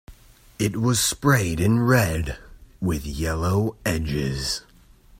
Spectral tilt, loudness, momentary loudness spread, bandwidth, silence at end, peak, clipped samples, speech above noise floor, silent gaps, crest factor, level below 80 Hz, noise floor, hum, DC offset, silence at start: -5 dB/octave; -23 LUFS; 10 LU; 16.5 kHz; 0.6 s; -4 dBFS; under 0.1%; 29 dB; none; 18 dB; -38 dBFS; -51 dBFS; none; under 0.1%; 0.1 s